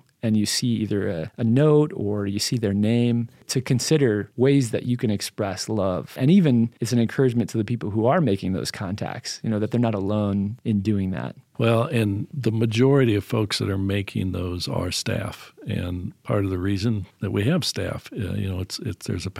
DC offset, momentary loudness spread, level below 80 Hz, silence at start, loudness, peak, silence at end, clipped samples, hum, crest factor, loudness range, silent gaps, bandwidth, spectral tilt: under 0.1%; 10 LU; -54 dBFS; 0.25 s; -23 LUFS; -6 dBFS; 0 s; under 0.1%; none; 16 dB; 4 LU; none; 16 kHz; -6 dB/octave